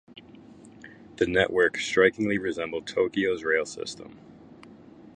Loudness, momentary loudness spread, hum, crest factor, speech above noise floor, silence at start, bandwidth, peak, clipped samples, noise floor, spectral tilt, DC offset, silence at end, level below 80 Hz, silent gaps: -25 LUFS; 15 LU; none; 22 dB; 24 dB; 0.1 s; 9.8 kHz; -6 dBFS; under 0.1%; -49 dBFS; -4.5 dB/octave; under 0.1%; 0.1 s; -58 dBFS; none